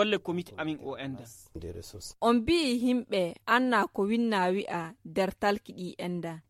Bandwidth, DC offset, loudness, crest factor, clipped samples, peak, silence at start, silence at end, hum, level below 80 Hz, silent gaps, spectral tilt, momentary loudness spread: 14.5 kHz; under 0.1%; -29 LUFS; 18 dB; under 0.1%; -10 dBFS; 0 s; 0.1 s; none; -58 dBFS; none; -5 dB/octave; 17 LU